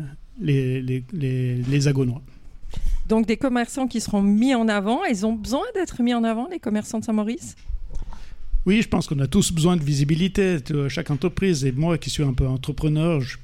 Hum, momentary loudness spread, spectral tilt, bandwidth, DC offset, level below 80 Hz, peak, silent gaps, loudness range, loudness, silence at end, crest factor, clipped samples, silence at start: none; 12 LU; -6 dB/octave; 16 kHz; under 0.1%; -32 dBFS; -8 dBFS; none; 3 LU; -22 LUFS; 0 s; 14 dB; under 0.1%; 0 s